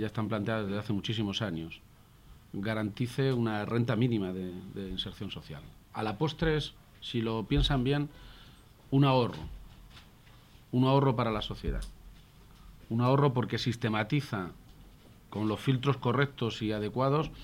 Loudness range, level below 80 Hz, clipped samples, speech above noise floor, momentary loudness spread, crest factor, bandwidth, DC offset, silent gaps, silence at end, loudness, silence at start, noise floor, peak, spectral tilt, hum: 3 LU; -46 dBFS; under 0.1%; 26 dB; 16 LU; 18 dB; 15.5 kHz; under 0.1%; none; 0 s; -31 LUFS; 0 s; -56 dBFS; -12 dBFS; -7 dB/octave; none